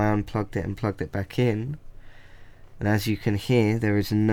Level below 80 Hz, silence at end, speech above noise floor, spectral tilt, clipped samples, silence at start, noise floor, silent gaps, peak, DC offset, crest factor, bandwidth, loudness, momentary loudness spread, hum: -44 dBFS; 0 s; 21 dB; -7 dB/octave; under 0.1%; 0 s; -45 dBFS; none; -6 dBFS; under 0.1%; 18 dB; 17 kHz; -26 LUFS; 9 LU; none